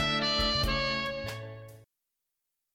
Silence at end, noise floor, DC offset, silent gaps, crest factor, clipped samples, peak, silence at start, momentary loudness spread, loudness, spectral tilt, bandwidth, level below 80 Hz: 0.9 s; -85 dBFS; under 0.1%; none; 16 dB; under 0.1%; -16 dBFS; 0 s; 17 LU; -29 LUFS; -4 dB/octave; 17 kHz; -42 dBFS